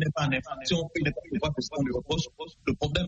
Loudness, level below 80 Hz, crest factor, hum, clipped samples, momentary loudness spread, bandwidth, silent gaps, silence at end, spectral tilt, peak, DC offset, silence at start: -30 LUFS; -46 dBFS; 18 dB; none; under 0.1%; 4 LU; 8.2 kHz; none; 0 s; -5.5 dB/octave; -12 dBFS; under 0.1%; 0 s